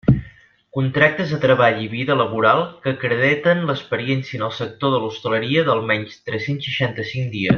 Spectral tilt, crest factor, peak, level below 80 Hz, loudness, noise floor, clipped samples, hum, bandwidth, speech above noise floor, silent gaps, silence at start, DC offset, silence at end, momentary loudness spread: -7 dB/octave; 18 dB; -2 dBFS; -46 dBFS; -19 LUFS; -47 dBFS; under 0.1%; none; 6.8 kHz; 28 dB; none; 0.05 s; under 0.1%; 0 s; 9 LU